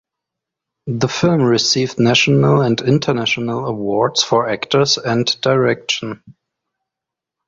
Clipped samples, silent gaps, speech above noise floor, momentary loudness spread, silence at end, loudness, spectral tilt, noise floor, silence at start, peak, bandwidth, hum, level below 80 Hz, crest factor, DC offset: under 0.1%; none; 68 dB; 8 LU; 1.15 s; -15 LUFS; -4.5 dB/octave; -84 dBFS; 0.85 s; -2 dBFS; 7.8 kHz; none; -52 dBFS; 16 dB; under 0.1%